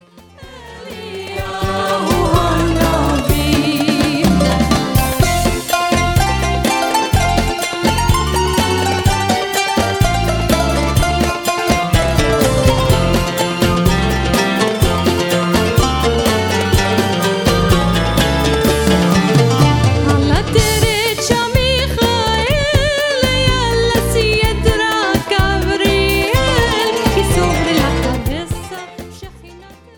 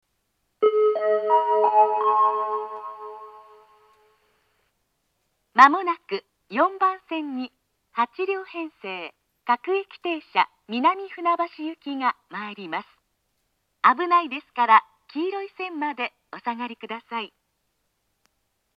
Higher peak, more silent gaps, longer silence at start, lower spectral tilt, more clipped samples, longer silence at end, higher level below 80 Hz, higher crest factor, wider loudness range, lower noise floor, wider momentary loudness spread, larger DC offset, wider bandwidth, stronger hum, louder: about the same, 0 dBFS vs 0 dBFS; neither; second, 0.15 s vs 0.6 s; about the same, -5 dB/octave vs -4.5 dB/octave; neither; second, 0.25 s vs 1.5 s; first, -24 dBFS vs -80 dBFS; second, 14 dB vs 24 dB; second, 2 LU vs 6 LU; second, -39 dBFS vs -74 dBFS; second, 4 LU vs 16 LU; neither; first, 19.5 kHz vs 7.6 kHz; neither; first, -14 LUFS vs -23 LUFS